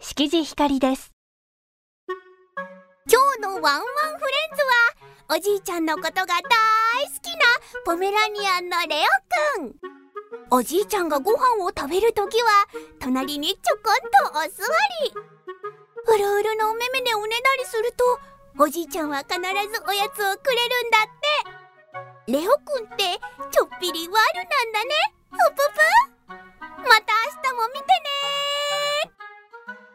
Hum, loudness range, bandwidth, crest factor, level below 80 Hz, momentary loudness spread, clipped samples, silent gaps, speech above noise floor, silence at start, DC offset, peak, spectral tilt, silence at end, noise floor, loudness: none; 3 LU; 16 kHz; 20 dB; -58 dBFS; 18 LU; under 0.1%; 1.13-2.07 s; 22 dB; 0 s; under 0.1%; -2 dBFS; -1.5 dB/octave; 0.15 s; -43 dBFS; -21 LUFS